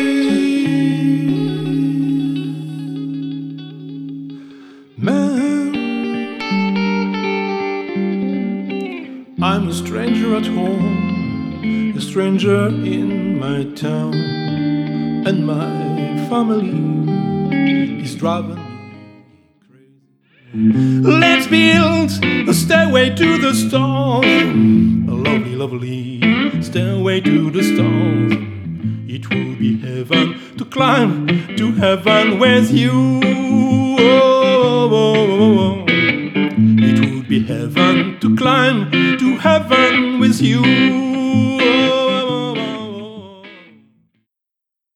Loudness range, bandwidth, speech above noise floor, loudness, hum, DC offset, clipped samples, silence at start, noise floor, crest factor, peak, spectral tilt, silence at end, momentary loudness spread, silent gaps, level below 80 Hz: 8 LU; 14.5 kHz; 69 dB; -15 LUFS; none; under 0.1%; under 0.1%; 0 s; -83 dBFS; 16 dB; 0 dBFS; -6 dB/octave; 1.4 s; 12 LU; none; -52 dBFS